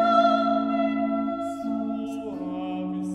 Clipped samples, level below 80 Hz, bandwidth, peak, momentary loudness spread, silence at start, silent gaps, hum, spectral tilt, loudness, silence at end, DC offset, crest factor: under 0.1%; -62 dBFS; 11 kHz; -8 dBFS; 12 LU; 0 s; none; none; -7 dB/octave; -26 LUFS; 0 s; under 0.1%; 16 dB